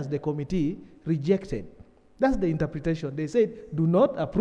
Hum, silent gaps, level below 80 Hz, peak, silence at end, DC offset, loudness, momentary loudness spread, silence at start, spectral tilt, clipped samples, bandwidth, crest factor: none; none; -46 dBFS; -10 dBFS; 0 s; under 0.1%; -27 LUFS; 8 LU; 0 s; -8.5 dB/octave; under 0.1%; 8.8 kHz; 18 dB